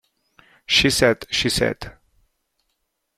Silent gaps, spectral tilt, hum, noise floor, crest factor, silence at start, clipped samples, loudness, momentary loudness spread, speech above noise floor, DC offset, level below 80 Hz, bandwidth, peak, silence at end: none; -3 dB/octave; none; -74 dBFS; 22 dB; 0.7 s; under 0.1%; -18 LUFS; 14 LU; 54 dB; under 0.1%; -44 dBFS; 16 kHz; -2 dBFS; 1.25 s